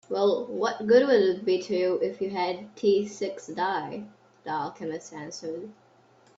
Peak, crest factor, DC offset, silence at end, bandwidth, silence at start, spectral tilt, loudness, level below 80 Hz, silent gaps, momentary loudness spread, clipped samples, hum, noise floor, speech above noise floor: -8 dBFS; 18 dB; under 0.1%; 0.65 s; 8 kHz; 0.1 s; -5 dB/octave; -27 LUFS; -72 dBFS; none; 16 LU; under 0.1%; none; -59 dBFS; 33 dB